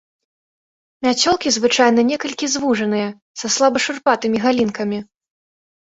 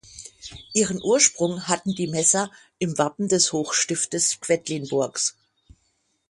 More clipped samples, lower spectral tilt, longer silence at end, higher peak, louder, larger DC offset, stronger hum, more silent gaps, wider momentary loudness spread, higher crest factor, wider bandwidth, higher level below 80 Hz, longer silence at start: neither; about the same, -3 dB/octave vs -3 dB/octave; about the same, 0.9 s vs 1 s; about the same, -2 dBFS vs -2 dBFS; first, -17 LUFS vs -22 LUFS; neither; neither; first, 3.22-3.34 s vs none; about the same, 10 LU vs 11 LU; about the same, 18 dB vs 22 dB; second, 8 kHz vs 11.5 kHz; about the same, -58 dBFS vs -60 dBFS; first, 1 s vs 0.1 s